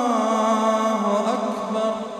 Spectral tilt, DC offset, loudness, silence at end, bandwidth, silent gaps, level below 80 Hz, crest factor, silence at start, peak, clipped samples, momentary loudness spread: -5 dB/octave; under 0.1%; -21 LUFS; 0 s; 13.5 kHz; none; -70 dBFS; 14 dB; 0 s; -8 dBFS; under 0.1%; 5 LU